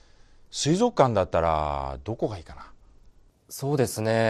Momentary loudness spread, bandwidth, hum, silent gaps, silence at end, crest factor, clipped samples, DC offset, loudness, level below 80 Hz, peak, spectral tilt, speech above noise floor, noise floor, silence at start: 15 LU; 14.5 kHz; none; none; 0 s; 22 dB; under 0.1%; under 0.1%; -25 LUFS; -46 dBFS; -6 dBFS; -5.5 dB/octave; 30 dB; -55 dBFS; 0.55 s